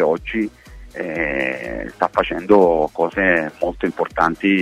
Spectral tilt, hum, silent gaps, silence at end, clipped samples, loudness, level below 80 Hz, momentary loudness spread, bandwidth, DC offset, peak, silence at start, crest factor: -6.5 dB/octave; none; none; 0 s; under 0.1%; -19 LUFS; -42 dBFS; 12 LU; 13 kHz; under 0.1%; -2 dBFS; 0 s; 18 dB